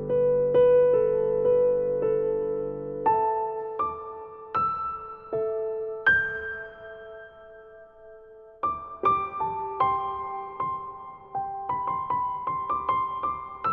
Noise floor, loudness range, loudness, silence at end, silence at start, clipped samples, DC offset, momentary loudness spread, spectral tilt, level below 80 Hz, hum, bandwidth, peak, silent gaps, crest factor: -49 dBFS; 6 LU; -26 LUFS; 0 s; 0 s; under 0.1%; under 0.1%; 16 LU; -8 dB/octave; -56 dBFS; none; 4.3 kHz; -10 dBFS; none; 16 dB